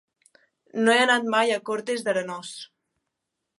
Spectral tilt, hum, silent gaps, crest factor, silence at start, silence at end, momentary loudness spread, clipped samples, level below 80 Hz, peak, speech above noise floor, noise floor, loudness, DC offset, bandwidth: -3 dB/octave; none; none; 20 dB; 0.75 s; 0.95 s; 17 LU; under 0.1%; -82 dBFS; -6 dBFS; 59 dB; -83 dBFS; -23 LUFS; under 0.1%; 11.5 kHz